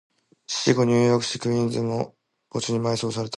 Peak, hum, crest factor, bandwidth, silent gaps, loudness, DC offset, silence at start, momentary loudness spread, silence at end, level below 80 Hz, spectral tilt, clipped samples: -6 dBFS; none; 18 dB; 11.5 kHz; none; -23 LUFS; under 0.1%; 0.5 s; 11 LU; 0 s; -62 dBFS; -5 dB/octave; under 0.1%